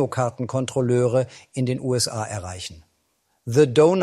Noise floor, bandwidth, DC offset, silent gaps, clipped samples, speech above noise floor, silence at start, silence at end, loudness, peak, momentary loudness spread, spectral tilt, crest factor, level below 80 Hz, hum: -69 dBFS; 14 kHz; under 0.1%; none; under 0.1%; 48 dB; 0 s; 0 s; -22 LUFS; -4 dBFS; 15 LU; -5.5 dB/octave; 18 dB; -58 dBFS; none